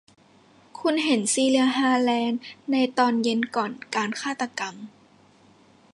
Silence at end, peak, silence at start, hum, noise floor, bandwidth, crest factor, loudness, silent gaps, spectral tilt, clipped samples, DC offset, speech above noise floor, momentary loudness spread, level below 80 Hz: 1.05 s; -8 dBFS; 0.75 s; none; -56 dBFS; 11.5 kHz; 18 dB; -24 LUFS; none; -3 dB/octave; under 0.1%; under 0.1%; 32 dB; 11 LU; -76 dBFS